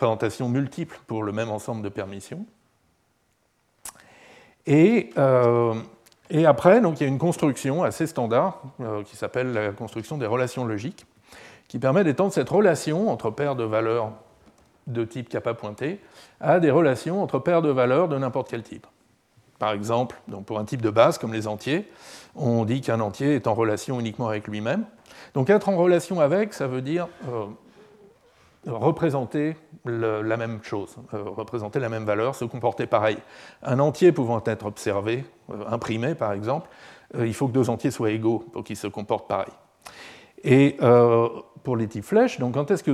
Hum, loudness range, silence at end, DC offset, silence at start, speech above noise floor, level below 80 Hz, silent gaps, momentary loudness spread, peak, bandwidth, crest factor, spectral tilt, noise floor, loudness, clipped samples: none; 7 LU; 0 s; under 0.1%; 0 s; 45 dB; -66 dBFS; none; 16 LU; -2 dBFS; 14.5 kHz; 22 dB; -7 dB/octave; -68 dBFS; -24 LUFS; under 0.1%